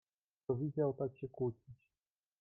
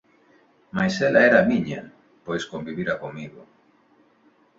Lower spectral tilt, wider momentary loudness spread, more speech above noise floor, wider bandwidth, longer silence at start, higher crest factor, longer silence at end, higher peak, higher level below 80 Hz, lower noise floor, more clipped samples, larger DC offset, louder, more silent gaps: first, -12 dB/octave vs -6 dB/octave; second, 11 LU vs 21 LU; first, over 51 dB vs 38 dB; second, 3 kHz vs 7.8 kHz; second, 0.5 s vs 0.75 s; about the same, 18 dB vs 20 dB; second, 0.65 s vs 1.15 s; second, -24 dBFS vs -4 dBFS; second, -74 dBFS vs -60 dBFS; first, under -90 dBFS vs -60 dBFS; neither; neither; second, -40 LUFS vs -22 LUFS; neither